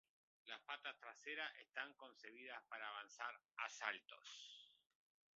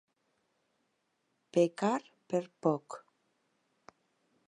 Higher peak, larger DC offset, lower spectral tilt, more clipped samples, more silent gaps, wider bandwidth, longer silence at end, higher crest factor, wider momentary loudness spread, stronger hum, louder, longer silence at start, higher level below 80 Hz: second, -26 dBFS vs -14 dBFS; neither; second, 3.5 dB/octave vs -6.5 dB/octave; neither; first, 3.45-3.49 s vs none; second, 7.6 kHz vs 11.5 kHz; second, 0.65 s vs 1.5 s; first, 28 dB vs 22 dB; about the same, 12 LU vs 12 LU; neither; second, -52 LUFS vs -33 LUFS; second, 0.45 s vs 1.55 s; about the same, under -90 dBFS vs -86 dBFS